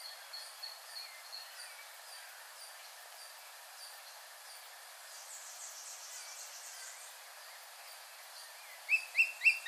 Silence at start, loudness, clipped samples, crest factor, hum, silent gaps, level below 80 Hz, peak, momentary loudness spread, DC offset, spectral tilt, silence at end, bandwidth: 0 s; -40 LUFS; under 0.1%; 26 dB; none; none; under -90 dBFS; -16 dBFS; 18 LU; under 0.1%; 7.5 dB/octave; 0 s; over 20 kHz